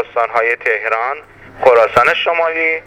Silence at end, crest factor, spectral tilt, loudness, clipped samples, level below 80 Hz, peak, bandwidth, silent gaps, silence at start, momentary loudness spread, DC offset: 0.05 s; 14 dB; -3.5 dB/octave; -13 LUFS; under 0.1%; -52 dBFS; 0 dBFS; 13 kHz; none; 0 s; 8 LU; under 0.1%